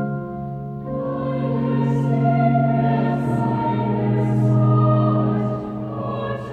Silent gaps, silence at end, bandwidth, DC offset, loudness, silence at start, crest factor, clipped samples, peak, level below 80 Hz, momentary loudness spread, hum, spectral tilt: none; 0 s; 4.5 kHz; under 0.1%; -20 LUFS; 0 s; 14 dB; under 0.1%; -6 dBFS; -48 dBFS; 11 LU; none; -10.5 dB/octave